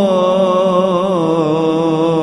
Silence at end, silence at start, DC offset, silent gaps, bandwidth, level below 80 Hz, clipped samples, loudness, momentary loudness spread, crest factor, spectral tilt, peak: 0 s; 0 s; under 0.1%; none; 11.5 kHz; -52 dBFS; under 0.1%; -14 LUFS; 2 LU; 10 dB; -7.5 dB/octave; -2 dBFS